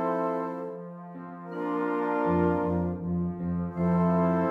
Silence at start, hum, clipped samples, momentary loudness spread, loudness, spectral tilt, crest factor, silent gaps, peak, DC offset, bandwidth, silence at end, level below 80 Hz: 0 s; none; under 0.1%; 16 LU; -28 LUFS; -10.5 dB/octave; 14 dB; none; -14 dBFS; under 0.1%; 3.7 kHz; 0 s; -58 dBFS